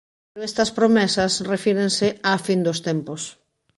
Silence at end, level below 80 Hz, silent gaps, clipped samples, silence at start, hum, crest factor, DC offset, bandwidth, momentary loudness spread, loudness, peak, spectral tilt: 0.45 s; -56 dBFS; none; under 0.1%; 0.35 s; none; 16 dB; under 0.1%; 11.5 kHz; 14 LU; -21 LUFS; -6 dBFS; -4 dB/octave